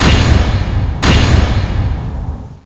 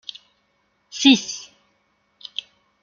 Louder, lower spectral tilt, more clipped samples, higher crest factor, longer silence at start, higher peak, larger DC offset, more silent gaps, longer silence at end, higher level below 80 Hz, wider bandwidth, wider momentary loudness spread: first, -13 LUFS vs -19 LUFS; first, -5.5 dB/octave vs -2 dB/octave; neither; second, 12 dB vs 22 dB; second, 0 s vs 0.95 s; about the same, 0 dBFS vs -2 dBFS; neither; neither; second, 0.1 s vs 1.4 s; first, -16 dBFS vs -68 dBFS; first, 8.2 kHz vs 7.4 kHz; second, 12 LU vs 22 LU